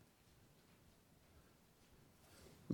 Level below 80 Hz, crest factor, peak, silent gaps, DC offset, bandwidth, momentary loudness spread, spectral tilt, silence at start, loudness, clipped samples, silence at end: -78 dBFS; 30 dB; -22 dBFS; none; under 0.1%; 19 kHz; 6 LU; -6.5 dB/octave; 0 s; -68 LUFS; under 0.1%; 0 s